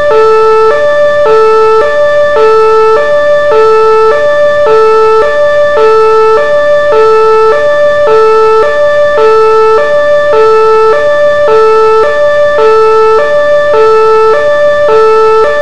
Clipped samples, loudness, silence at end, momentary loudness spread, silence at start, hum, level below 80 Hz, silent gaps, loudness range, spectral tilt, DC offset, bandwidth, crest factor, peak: 6%; -5 LUFS; 0 s; 2 LU; 0 s; none; -36 dBFS; none; 0 LU; -4 dB/octave; 20%; 9.4 kHz; 6 dB; 0 dBFS